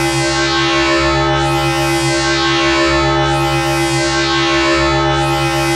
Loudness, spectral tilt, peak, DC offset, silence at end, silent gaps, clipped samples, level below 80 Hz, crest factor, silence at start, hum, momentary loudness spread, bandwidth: -13 LUFS; -4 dB/octave; -4 dBFS; under 0.1%; 0 s; none; under 0.1%; -30 dBFS; 10 dB; 0 s; none; 2 LU; 15 kHz